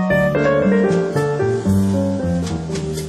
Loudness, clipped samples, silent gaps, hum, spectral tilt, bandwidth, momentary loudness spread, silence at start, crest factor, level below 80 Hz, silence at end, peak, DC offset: -18 LUFS; under 0.1%; none; none; -7 dB/octave; 14 kHz; 7 LU; 0 s; 10 dB; -40 dBFS; 0 s; -6 dBFS; under 0.1%